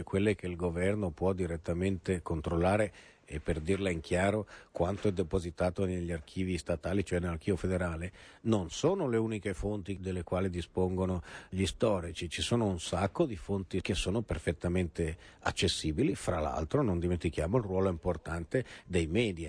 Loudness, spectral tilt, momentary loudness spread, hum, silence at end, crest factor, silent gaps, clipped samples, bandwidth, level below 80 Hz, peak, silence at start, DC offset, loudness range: -33 LUFS; -6 dB/octave; 7 LU; none; 0 s; 18 dB; none; under 0.1%; 11 kHz; -48 dBFS; -14 dBFS; 0 s; under 0.1%; 2 LU